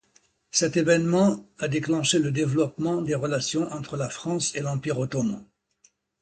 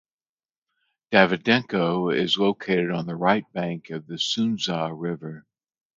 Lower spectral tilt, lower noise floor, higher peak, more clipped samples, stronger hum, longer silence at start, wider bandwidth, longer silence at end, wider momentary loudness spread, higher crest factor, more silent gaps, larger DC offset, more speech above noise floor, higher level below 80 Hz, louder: about the same, -4.5 dB/octave vs -5 dB/octave; second, -65 dBFS vs under -90 dBFS; second, -6 dBFS vs -2 dBFS; neither; neither; second, 0.55 s vs 1.1 s; first, 9.4 kHz vs 7.8 kHz; first, 0.8 s vs 0.55 s; second, 9 LU vs 12 LU; about the same, 20 dB vs 24 dB; neither; neither; second, 40 dB vs over 66 dB; about the same, -60 dBFS vs -64 dBFS; about the same, -25 LUFS vs -23 LUFS